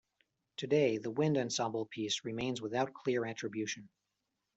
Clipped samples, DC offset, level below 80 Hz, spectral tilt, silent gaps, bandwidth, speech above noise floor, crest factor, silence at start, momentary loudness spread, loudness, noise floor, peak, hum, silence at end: under 0.1%; under 0.1%; -76 dBFS; -4.5 dB/octave; none; 8.2 kHz; 51 dB; 18 dB; 0.6 s; 9 LU; -35 LUFS; -86 dBFS; -18 dBFS; none; 0.7 s